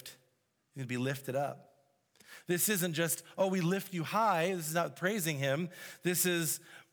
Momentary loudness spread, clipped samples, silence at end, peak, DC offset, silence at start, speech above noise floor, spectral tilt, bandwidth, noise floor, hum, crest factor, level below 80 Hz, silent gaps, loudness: 11 LU; under 0.1%; 0.1 s; -16 dBFS; under 0.1%; 0.05 s; 43 dB; -4 dB/octave; over 20 kHz; -76 dBFS; none; 18 dB; -86 dBFS; none; -33 LUFS